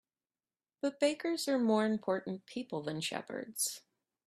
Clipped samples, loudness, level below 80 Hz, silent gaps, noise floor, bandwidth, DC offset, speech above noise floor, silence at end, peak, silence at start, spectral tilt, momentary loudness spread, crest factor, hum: under 0.1%; -35 LUFS; -80 dBFS; none; under -90 dBFS; 15.5 kHz; under 0.1%; over 56 dB; 0.45 s; -16 dBFS; 0.85 s; -4 dB/octave; 11 LU; 20 dB; none